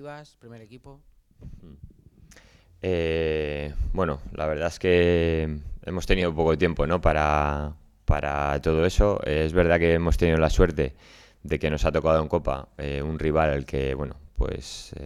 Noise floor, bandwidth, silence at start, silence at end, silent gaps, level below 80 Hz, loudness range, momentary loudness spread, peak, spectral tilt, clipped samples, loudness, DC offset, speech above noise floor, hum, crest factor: -53 dBFS; 13 kHz; 0 s; 0 s; none; -32 dBFS; 7 LU; 12 LU; -6 dBFS; -6.5 dB/octave; under 0.1%; -25 LUFS; under 0.1%; 29 dB; none; 20 dB